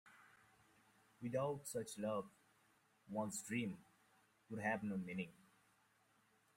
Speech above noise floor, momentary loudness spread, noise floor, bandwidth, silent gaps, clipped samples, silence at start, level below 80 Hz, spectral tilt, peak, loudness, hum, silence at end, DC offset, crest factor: 33 dB; 11 LU; -77 dBFS; 16 kHz; none; under 0.1%; 0.05 s; -82 dBFS; -5 dB/octave; -28 dBFS; -45 LUFS; none; 1.25 s; under 0.1%; 20 dB